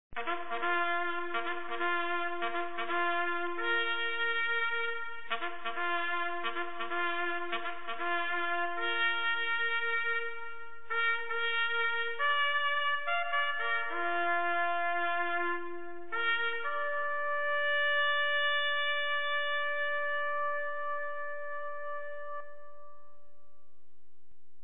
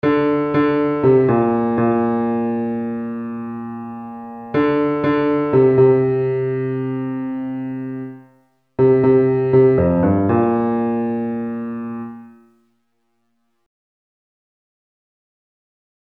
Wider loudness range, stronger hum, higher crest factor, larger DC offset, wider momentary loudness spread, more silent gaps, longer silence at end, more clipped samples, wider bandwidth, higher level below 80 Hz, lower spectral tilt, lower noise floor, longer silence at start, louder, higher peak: second, 5 LU vs 9 LU; neither; about the same, 16 dB vs 16 dB; first, 1% vs under 0.1%; second, 10 LU vs 15 LU; neither; second, 1.65 s vs 3.75 s; neither; second, 4.1 kHz vs 4.8 kHz; second, -72 dBFS vs -50 dBFS; second, -5.5 dB/octave vs -11 dB/octave; first, -75 dBFS vs -70 dBFS; about the same, 0.1 s vs 0.05 s; second, -32 LUFS vs -18 LUFS; second, -16 dBFS vs -2 dBFS